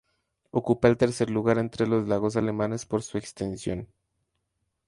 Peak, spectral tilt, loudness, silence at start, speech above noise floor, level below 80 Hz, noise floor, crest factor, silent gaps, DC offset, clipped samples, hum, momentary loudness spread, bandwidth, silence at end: -6 dBFS; -6.5 dB/octave; -26 LUFS; 0.55 s; 53 dB; -54 dBFS; -78 dBFS; 20 dB; none; under 0.1%; under 0.1%; none; 11 LU; 11.5 kHz; 1 s